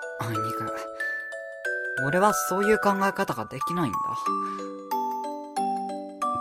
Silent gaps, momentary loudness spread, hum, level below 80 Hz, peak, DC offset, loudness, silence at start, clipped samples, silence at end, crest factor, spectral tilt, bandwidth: none; 11 LU; none; -62 dBFS; -6 dBFS; under 0.1%; -27 LUFS; 0 s; under 0.1%; 0 s; 22 dB; -4.5 dB/octave; 16 kHz